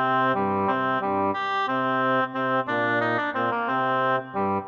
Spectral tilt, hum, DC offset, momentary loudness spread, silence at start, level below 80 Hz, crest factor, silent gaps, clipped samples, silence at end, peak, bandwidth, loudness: -7 dB/octave; none; under 0.1%; 3 LU; 0 s; -76 dBFS; 12 dB; none; under 0.1%; 0 s; -12 dBFS; 7 kHz; -24 LUFS